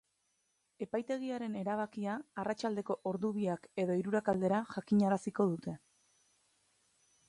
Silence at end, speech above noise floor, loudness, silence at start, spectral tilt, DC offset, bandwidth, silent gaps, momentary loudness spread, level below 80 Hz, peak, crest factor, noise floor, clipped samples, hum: 1.5 s; 45 dB; -36 LUFS; 0.8 s; -7.5 dB/octave; under 0.1%; 11 kHz; none; 8 LU; -76 dBFS; -18 dBFS; 18 dB; -79 dBFS; under 0.1%; none